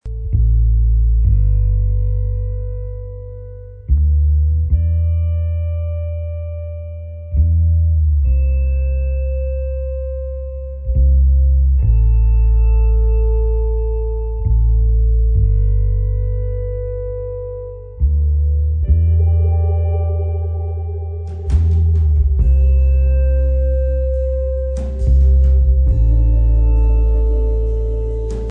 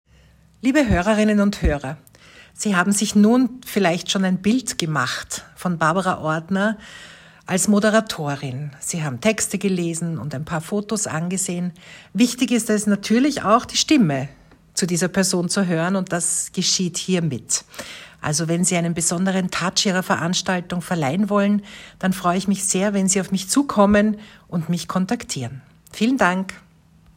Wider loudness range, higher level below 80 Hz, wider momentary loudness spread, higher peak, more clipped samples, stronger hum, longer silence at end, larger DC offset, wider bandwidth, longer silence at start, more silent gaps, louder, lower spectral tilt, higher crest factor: about the same, 4 LU vs 3 LU; first, -16 dBFS vs -42 dBFS; about the same, 11 LU vs 11 LU; about the same, -4 dBFS vs -2 dBFS; neither; neither; second, 0 s vs 0.6 s; neither; second, 2.8 kHz vs 16.5 kHz; second, 0.05 s vs 0.65 s; neither; first, -17 LUFS vs -20 LUFS; first, -11 dB/octave vs -4 dB/octave; second, 10 dB vs 20 dB